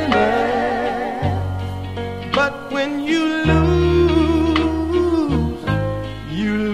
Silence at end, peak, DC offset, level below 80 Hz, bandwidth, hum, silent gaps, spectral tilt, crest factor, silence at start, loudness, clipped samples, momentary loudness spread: 0 s; -2 dBFS; 0.5%; -30 dBFS; 12 kHz; none; none; -7 dB/octave; 16 dB; 0 s; -19 LUFS; under 0.1%; 11 LU